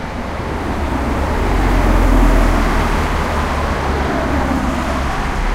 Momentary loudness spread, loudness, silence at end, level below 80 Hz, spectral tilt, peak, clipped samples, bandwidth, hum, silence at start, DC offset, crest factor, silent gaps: 6 LU; -17 LUFS; 0 s; -18 dBFS; -6 dB/octave; 0 dBFS; under 0.1%; 15 kHz; none; 0 s; under 0.1%; 14 dB; none